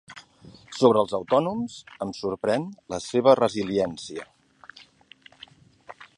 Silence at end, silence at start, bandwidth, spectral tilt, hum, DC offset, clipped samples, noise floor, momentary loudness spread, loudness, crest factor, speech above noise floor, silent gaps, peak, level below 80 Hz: 0.1 s; 0.1 s; 11 kHz; -5.5 dB/octave; none; under 0.1%; under 0.1%; -54 dBFS; 20 LU; -24 LUFS; 22 dB; 30 dB; none; -4 dBFS; -62 dBFS